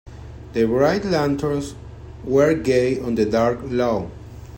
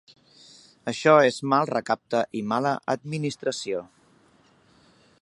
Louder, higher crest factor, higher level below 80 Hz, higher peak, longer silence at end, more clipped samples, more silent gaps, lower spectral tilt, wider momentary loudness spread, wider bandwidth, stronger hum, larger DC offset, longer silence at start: first, -20 LUFS vs -24 LUFS; second, 16 dB vs 22 dB; first, -42 dBFS vs -72 dBFS; about the same, -4 dBFS vs -4 dBFS; second, 0 s vs 1.4 s; neither; neither; first, -6.5 dB/octave vs -5 dB/octave; first, 21 LU vs 13 LU; first, 16.5 kHz vs 11.5 kHz; neither; neither; second, 0.05 s vs 0.85 s